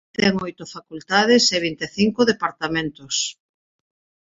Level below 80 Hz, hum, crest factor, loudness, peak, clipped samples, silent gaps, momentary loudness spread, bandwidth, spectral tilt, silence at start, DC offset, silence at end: -56 dBFS; none; 20 dB; -20 LUFS; -2 dBFS; under 0.1%; none; 16 LU; 7.8 kHz; -3.5 dB/octave; 0.2 s; under 0.1%; 1 s